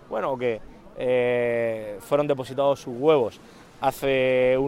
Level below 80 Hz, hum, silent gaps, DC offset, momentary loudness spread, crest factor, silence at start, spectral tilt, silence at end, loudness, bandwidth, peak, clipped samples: -54 dBFS; none; none; under 0.1%; 8 LU; 18 dB; 0.1 s; -6 dB/octave; 0 s; -24 LUFS; 16.5 kHz; -6 dBFS; under 0.1%